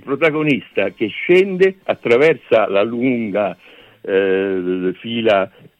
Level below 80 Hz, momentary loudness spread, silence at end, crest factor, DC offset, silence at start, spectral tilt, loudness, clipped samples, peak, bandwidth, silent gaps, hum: -62 dBFS; 8 LU; 0.35 s; 14 dB; under 0.1%; 0.05 s; -7 dB/octave; -17 LUFS; under 0.1%; -2 dBFS; 8.4 kHz; none; none